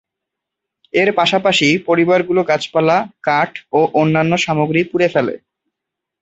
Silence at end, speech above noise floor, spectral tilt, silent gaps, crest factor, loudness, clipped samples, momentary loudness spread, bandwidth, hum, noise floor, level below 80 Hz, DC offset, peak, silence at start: 0.85 s; 66 dB; -5 dB/octave; none; 14 dB; -15 LUFS; under 0.1%; 5 LU; 8.2 kHz; none; -81 dBFS; -58 dBFS; under 0.1%; -2 dBFS; 0.95 s